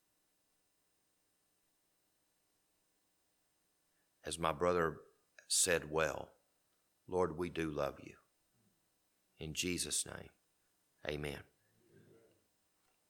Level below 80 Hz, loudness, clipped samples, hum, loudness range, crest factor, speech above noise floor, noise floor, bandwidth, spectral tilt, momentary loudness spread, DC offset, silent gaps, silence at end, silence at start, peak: -66 dBFS; -37 LUFS; under 0.1%; none; 6 LU; 26 dB; 42 dB; -80 dBFS; 19 kHz; -3 dB/octave; 19 LU; under 0.1%; none; 1.65 s; 4.25 s; -16 dBFS